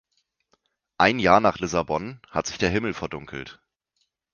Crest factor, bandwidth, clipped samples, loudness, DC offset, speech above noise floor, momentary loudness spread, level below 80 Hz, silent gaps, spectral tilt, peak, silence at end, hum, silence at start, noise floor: 24 dB; 10 kHz; under 0.1%; -23 LUFS; under 0.1%; 51 dB; 17 LU; -50 dBFS; none; -4.5 dB/octave; -2 dBFS; 0.8 s; none; 1 s; -75 dBFS